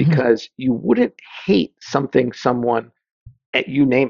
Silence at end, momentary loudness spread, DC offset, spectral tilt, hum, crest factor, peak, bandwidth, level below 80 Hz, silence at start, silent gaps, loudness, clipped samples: 0 s; 6 LU; under 0.1%; -7 dB/octave; none; 18 dB; -2 dBFS; 7.2 kHz; -54 dBFS; 0 s; 3.11-3.26 s, 3.46-3.53 s; -19 LUFS; under 0.1%